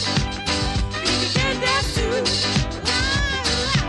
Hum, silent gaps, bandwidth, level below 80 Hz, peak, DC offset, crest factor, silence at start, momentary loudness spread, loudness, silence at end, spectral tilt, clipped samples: none; none; 12 kHz; -30 dBFS; -8 dBFS; under 0.1%; 14 dB; 0 s; 3 LU; -20 LUFS; 0 s; -3.5 dB/octave; under 0.1%